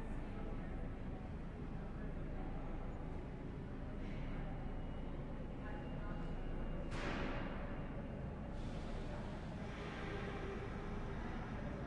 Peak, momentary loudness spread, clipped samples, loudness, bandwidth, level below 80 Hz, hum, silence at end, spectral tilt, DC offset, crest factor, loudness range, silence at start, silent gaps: -30 dBFS; 4 LU; under 0.1%; -47 LUFS; 9.2 kHz; -48 dBFS; none; 0 s; -7.5 dB/octave; under 0.1%; 14 dB; 2 LU; 0 s; none